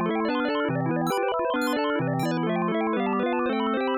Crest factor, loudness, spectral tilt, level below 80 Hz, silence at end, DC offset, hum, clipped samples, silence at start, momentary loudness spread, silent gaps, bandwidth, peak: 10 dB; -25 LUFS; -6.5 dB/octave; -62 dBFS; 0 s; under 0.1%; none; under 0.1%; 0 s; 1 LU; none; 15 kHz; -16 dBFS